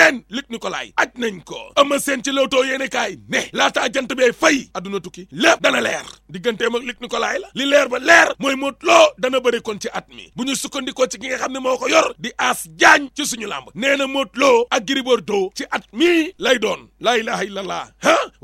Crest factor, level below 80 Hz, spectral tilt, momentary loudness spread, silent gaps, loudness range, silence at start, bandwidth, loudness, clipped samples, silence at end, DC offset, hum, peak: 18 dB; -56 dBFS; -2 dB/octave; 14 LU; none; 4 LU; 0 s; 16.5 kHz; -18 LUFS; under 0.1%; 0.15 s; under 0.1%; none; 0 dBFS